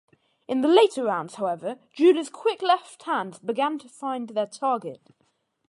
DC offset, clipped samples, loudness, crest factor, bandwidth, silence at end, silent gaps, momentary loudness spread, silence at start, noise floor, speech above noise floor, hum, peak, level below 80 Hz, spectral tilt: under 0.1%; under 0.1%; -25 LUFS; 20 dB; 11.5 kHz; 0.7 s; none; 12 LU; 0.5 s; -70 dBFS; 46 dB; none; -6 dBFS; -80 dBFS; -4.5 dB/octave